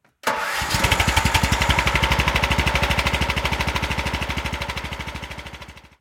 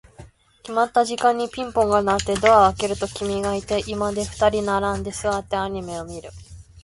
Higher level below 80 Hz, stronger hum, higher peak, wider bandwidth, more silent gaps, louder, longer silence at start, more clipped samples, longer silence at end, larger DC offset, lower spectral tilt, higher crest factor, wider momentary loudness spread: first, -30 dBFS vs -42 dBFS; neither; about the same, -2 dBFS vs -2 dBFS; first, 17 kHz vs 11.5 kHz; neither; about the same, -21 LUFS vs -21 LUFS; about the same, 0.25 s vs 0.2 s; neither; first, 0.2 s vs 0.05 s; neither; about the same, -3.5 dB/octave vs -4.5 dB/octave; about the same, 20 dB vs 20 dB; about the same, 13 LU vs 12 LU